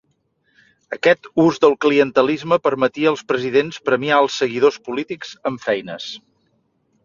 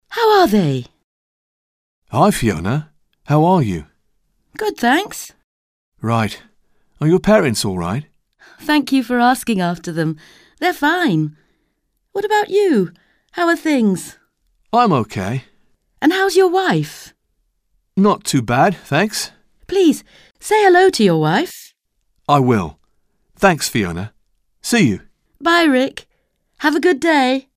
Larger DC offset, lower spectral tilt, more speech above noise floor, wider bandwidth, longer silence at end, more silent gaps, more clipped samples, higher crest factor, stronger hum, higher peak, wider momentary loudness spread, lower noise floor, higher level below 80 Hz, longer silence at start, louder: neither; about the same, -5 dB/octave vs -5.5 dB/octave; second, 48 dB vs 53 dB; second, 7.4 kHz vs 16 kHz; first, 0.85 s vs 0.15 s; second, none vs 1.04-2.02 s, 5.44-5.92 s; neither; about the same, 18 dB vs 16 dB; neither; about the same, 0 dBFS vs -2 dBFS; about the same, 13 LU vs 15 LU; about the same, -66 dBFS vs -68 dBFS; second, -62 dBFS vs -48 dBFS; first, 0.9 s vs 0.1 s; about the same, -18 LUFS vs -16 LUFS